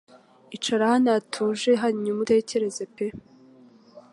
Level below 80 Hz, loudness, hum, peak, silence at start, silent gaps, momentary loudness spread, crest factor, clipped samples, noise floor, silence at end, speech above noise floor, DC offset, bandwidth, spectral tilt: -66 dBFS; -24 LUFS; none; -10 dBFS; 0.5 s; none; 11 LU; 16 dB; under 0.1%; -52 dBFS; 0.15 s; 29 dB; under 0.1%; 11.5 kHz; -4.5 dB/octave